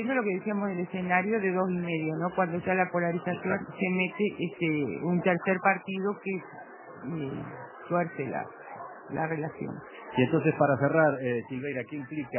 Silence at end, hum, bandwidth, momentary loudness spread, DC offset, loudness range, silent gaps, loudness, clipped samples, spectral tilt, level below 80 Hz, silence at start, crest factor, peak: 0 s; none; 3.2 kHz; 14 LU; under 0.1%; 6 LU; none; -29 LUFS; under 0.1%; -6 dB/octave; -68 dBFS; 0 s; 22 dB; -8 dBFS